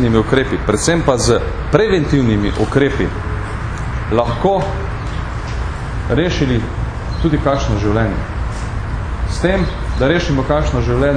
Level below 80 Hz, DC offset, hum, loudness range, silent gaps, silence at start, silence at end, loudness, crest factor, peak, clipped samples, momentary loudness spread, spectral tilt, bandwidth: -24 dBFS; under 0.1%; none; 4 LU; none; 0 s; 0 s; -17 LUFS; 16 dB; 0 dBFS; under 0.1%; 9 LU; -6 dB/octave; 10 kHz